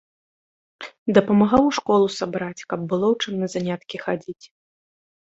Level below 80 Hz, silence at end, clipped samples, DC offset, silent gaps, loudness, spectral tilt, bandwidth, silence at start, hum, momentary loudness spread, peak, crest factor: -54 dBFS; 1.05 s; under 0.1%; under 0.1%; 0.98-1.06 s; -22 LUFS; -6 dB/octave; 8 kHz; 0.8 s; none; 15 LU; -2 dBFS; 20 dB